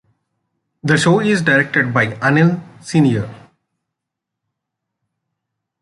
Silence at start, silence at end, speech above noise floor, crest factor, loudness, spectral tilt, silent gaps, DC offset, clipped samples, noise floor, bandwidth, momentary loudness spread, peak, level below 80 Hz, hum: 0.85 s; 2.45 s; 66 dB; 18 dB; -15 LUFS; -6 dB/octave; none; under 0.1%; under 0.1%; -81 dBFS; 11.5 kHz; 10 LU; -2 dBFS; -56 dBFS; none